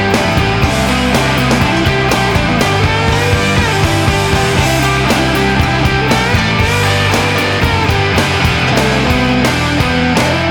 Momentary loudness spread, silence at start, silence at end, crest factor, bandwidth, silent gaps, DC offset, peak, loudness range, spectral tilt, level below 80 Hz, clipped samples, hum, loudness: 1 LU; 0 s; 0 s; 12 dB; 20 kHz; none; under 0.1%; 0 dBFS; 0 LU; -5 dB/octave; -24 dBFS; under 0.1%; none; -12 LUFS